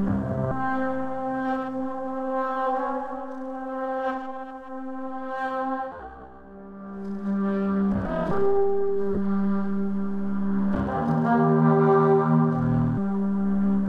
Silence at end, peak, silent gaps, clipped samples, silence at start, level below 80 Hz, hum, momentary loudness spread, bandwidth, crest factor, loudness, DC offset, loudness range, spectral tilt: 0 s; -8 dBFS; none; under 0.1%; 0 s; -46 dBFS; none; 16 LU; 5.2 kHz; 16 dB; -25 LUFS; under 0.1%; 10 LU; -10 dB/octave